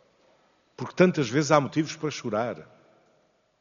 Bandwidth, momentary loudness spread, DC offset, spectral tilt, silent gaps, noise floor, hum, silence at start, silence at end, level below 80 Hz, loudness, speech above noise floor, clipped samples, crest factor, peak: 7.2 kHz; 16 LU; under 0.1%; -5.5 dB/octave; none; -67 dBFS; none; 0.8 s; 1 s; -70 dBFS; -25 LUFS; 42 dB; under 0.1%; 24 dB; -4 dBFS